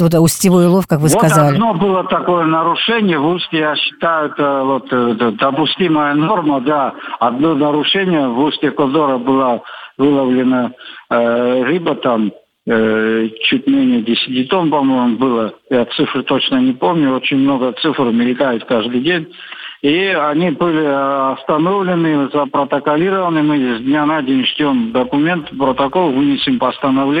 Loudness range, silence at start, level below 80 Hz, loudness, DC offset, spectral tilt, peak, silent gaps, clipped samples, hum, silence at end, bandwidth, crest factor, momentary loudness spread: 2 LU; 0 s; -52 dBFS; -14 LUFS; under 0.1%; -5.5 dB/octave; 0 dBFS; none; under 0.1%; none; 0 s; 16 kHz; 14 dB; 4 LU